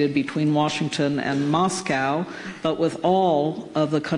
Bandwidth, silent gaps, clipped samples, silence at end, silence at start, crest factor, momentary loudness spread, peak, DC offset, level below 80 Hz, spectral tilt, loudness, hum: 11 kHz; none; under 0.1%; 0 s; 0 s; 14 dB; 6 LU; -10 dBFS; under 0.1%; -62 dBFS; -5.5 dB/octave; -23 LUFS; none